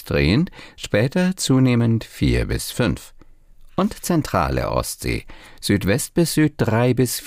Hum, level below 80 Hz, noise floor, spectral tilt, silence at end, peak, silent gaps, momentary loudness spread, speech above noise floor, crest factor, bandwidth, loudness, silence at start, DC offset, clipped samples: none; -34 dBFS; -45 dBFS; -5.5 dB/octave; 0 s; -6 dBFS; none; 9 LU; 25 dB; 14 dB; 16 kHz; -20 LUFS; 0 s; under 0.1%; under 0.1%